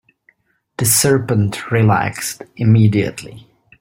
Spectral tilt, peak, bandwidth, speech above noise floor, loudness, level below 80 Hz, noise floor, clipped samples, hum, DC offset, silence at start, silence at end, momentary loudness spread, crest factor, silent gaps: -5 dB/octave; 0 dBFS; 16.5 kHz; 43 dB; -15 LUFS; -50 dBFS; -58 dBFS; under 0.1%; none; under 0.1%; 0.8 s; 0.4 s; 14 LU; 16 dB; none